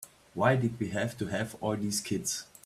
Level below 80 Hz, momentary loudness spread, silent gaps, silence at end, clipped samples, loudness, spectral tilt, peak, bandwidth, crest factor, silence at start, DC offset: -64 dBFS; 7 LU; none; 0.2 s; under 0.1%; -31 LUFS; -4.5 dB/octave; -12 dBFS; 15.5 kHz; 20 dB; 0 s; under 0.1%